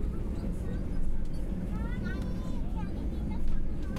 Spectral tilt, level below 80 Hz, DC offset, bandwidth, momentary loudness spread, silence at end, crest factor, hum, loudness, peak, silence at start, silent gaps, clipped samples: -8 dB/octave; -32 dBFS; under 0.1%; 5.4 kHz; 2 LU; 0 s; 12 dB; none; -36 LUFS; -16 dBFS; 0 s; none; under 0.1%